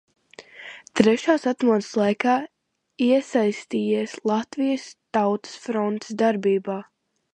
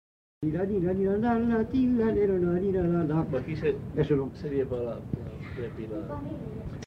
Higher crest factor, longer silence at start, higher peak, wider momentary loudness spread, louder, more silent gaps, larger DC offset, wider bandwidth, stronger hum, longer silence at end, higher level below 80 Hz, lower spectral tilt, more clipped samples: first, 22 dB vs 16 dB; about the same, 0.4 s vs 0.4 s; first, 0 dBFS vs -12 dBFS; about the same, 11 LU vs 12 LU; first, -23 LUFS vs -29 LUFS; neither; neither; first, 10 kHz vs 6.4 kHz; neither; first, 0.5 s vs 0 s; second, -68 dBFS vs -48 dBFS; second, -5.5 dB/octave vs -9.5 dB/octave; neither